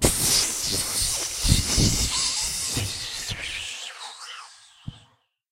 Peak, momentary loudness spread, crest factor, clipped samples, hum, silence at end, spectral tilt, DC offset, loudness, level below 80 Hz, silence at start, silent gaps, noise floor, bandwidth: -2 dBFS; 20 LU; 24 dB; under 0.1%; none; 0.55 s; -2 dB/octave; under 0.1%; -23 LUFS; -36 dBFS; 0 s; none; -61 dBFS; 16 kHz